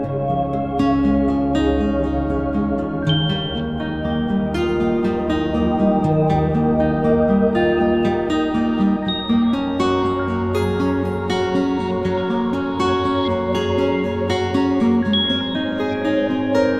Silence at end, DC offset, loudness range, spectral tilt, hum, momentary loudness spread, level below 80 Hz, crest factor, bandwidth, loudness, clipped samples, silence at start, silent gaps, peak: 0 s; 0.4%; 3 LU; -7 dB/octave; none; 4 LU; -36 dBFS; 14 dB; 11 kHz; -19 LUFS; under 0.1%; 0 s; none; -4 dBFS